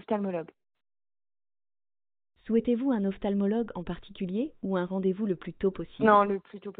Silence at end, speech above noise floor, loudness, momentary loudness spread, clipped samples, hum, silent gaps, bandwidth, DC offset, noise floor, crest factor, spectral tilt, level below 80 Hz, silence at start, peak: 0.1 s; over 62 dB; -29 LUFS; 13 LU; under 0.1%; none; none; 4.1 kHz; under 0.1%; under -90 dBFS; 22 dB; -6.5 dB/octave; -56 dBFS; 0.1 s; -8 dBFS